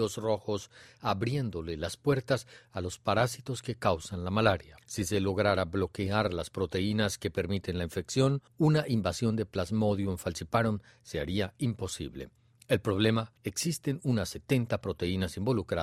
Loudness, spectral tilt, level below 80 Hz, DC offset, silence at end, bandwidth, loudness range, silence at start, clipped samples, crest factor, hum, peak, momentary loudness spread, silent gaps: -31 LUFS; -5.5 dB/octave; -56 dBFS; under 0.1%; 0 s; 15 kHz; 3 LU; 0 s; under 0.1%; 22 dB; none; -10 dBFS; 9 LU; none